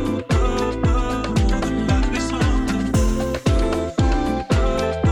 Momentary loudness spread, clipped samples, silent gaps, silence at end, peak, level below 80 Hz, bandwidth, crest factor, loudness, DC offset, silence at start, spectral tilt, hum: 2 LU; under 0.1%; none; 0 s; -6 dBFS; -24 dBFS; 18 kHz; 14 dB; -21 LUFS; under 0.1%; 0 s; -6.5 dB/octave; none